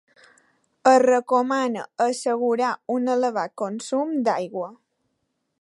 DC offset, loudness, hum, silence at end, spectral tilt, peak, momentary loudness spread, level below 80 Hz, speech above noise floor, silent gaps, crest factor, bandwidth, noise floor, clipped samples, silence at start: under 0.1%; -22 LUFS; none; 0.85 s; -4 dB/octave; -4 dBFS; 11 LU; -80 dBFS; 53 dB; none; 20 dB; 11.5 kHz; -75 dBFS; under 0.1%; 0.85 s